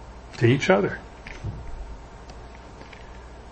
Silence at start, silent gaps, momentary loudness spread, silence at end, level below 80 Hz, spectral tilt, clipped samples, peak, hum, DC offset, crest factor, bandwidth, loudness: 0 s; none; 23 LU; 0 s; -42 dBFS; -6.5 dB/octave; under 0.1%; -4 dBFS; none; under 0.1%; 24 dB; 8.6 kHz; -24 LUFS